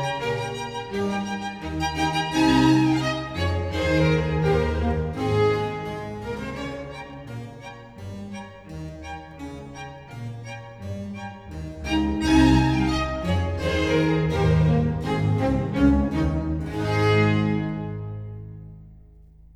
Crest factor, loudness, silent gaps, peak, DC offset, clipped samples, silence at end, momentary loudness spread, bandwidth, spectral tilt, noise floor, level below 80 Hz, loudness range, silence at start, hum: 18 dB; -23 LUFS; none; -6 dBFS; under 0.1%; under 0.1%; 0.1 s; 18 LU; 13.5 kHz; -6.5 dB/octave; -49 dBFS; -36 dBFS; 15 LU; 0 s; none